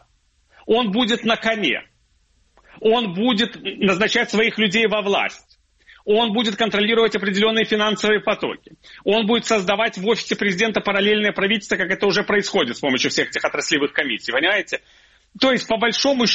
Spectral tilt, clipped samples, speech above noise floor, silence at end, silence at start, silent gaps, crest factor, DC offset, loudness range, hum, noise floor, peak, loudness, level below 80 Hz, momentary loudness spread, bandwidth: -3.5 dB/octave; under 0.1%; 42 dB; 0 s; 0.65 s; none; 18 dB; under 0.1%; 2 LU; none; -61 dBFS; -2 dBFS; -19 LUFS; -56 dBFS; 4 LU; 8.2 kHz